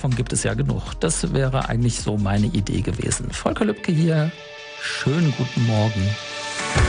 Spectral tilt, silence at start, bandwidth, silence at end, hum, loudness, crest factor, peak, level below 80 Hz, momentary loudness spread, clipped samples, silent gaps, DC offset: -5 dB/octave; 0 s; 10 kHz; 0 s; none; -22 LUFS; 18 dB; -4 dBFS; -34 dBFS; 6 LU; under 0.1%; none; under 0.1%